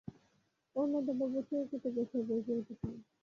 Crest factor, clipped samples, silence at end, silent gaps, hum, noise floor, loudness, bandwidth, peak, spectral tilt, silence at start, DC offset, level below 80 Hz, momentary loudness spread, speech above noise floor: 14 dB; under 0.1%; 0.2 s; none; none; -76 dBFS; -37 LUFS; 7 kHz; -24 dBFS; -9.5 dB/octave; 0.05 s; under 0.1%; -66 dBFS; 10 LU; 39 dB